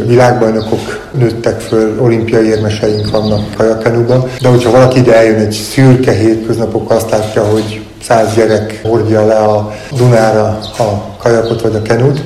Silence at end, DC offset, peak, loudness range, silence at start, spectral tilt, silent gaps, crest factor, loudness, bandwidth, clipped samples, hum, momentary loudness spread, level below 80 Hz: 0 s; under 0.1%; 0 dBFS; 3 LU; 0 s; -6.5 dB/octave; none; 10 dB; -10 LUFS; 13.5 kHz; 0.8%; none; 8 LU; -36 dBFS